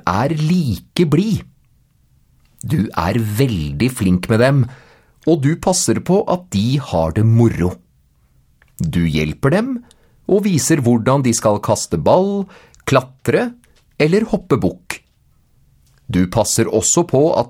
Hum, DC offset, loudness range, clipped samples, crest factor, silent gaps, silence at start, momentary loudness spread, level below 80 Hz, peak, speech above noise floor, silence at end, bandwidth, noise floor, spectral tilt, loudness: none; under 0.1%; 4 LU; under 0.1%; 16 dB; none; 0.05 s; 10 LU; -40 dBFS; 0 dBFS; 40 dB; 0 s; 16.5 kHz; -56 dBFS; -5.5 dB/octave; -16 LUFS